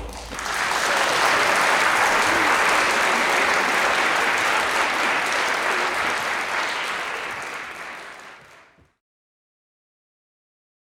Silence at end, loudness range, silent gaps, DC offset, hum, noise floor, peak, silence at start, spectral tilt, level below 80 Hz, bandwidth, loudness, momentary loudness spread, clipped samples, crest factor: 2.45 s; 14 LU; none; under 0.1%; none; -52 dBFS; -6 dBFS; 0 s; -1 dB/octave; -52 dBFS; 18.5 kHz; -20 LUFS; 13 LU; under 0.1%; 16 dB